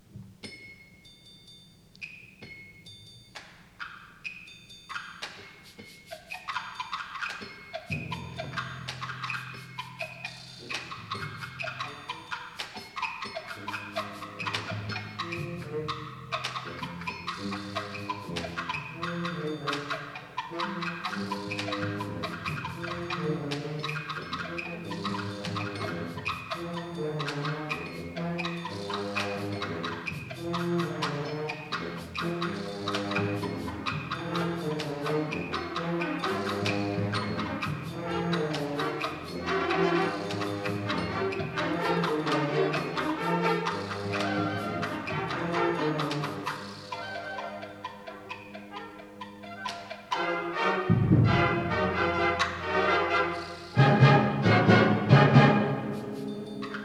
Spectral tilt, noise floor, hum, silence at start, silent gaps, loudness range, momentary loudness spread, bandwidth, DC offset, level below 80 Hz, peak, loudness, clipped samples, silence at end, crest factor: -6 dB/octave; -54 dBFS; none; 0.1 s; none; 14 LU; 16 LU; 13.5 kHz; under 0.1%; -58 dBFS; -6 dBFS; -30 LUFS; under 0.1%; 0 s; 24 dB